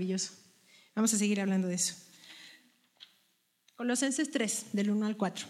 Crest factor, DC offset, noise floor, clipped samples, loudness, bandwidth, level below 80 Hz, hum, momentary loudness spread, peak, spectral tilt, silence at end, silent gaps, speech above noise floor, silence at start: 18 dB; under 0.1%; -74 dBFS; under 0.1%; -31 LUFS; 15 kHz; -84 dBFS; none; 21 LU; -16 dBFS; -4 dB/octave; 0 s; none; 42 dB; 0 s